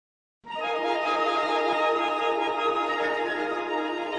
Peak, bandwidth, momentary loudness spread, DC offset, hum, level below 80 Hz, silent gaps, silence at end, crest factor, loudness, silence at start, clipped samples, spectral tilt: -12 dBFS; 9.8 kHz; 5 LU; under 0.1%; none; -68 dBFS; none; 0 s; 14 dB; -26 LUFS; 0.45 s; under 0.1%; -3 dB/octave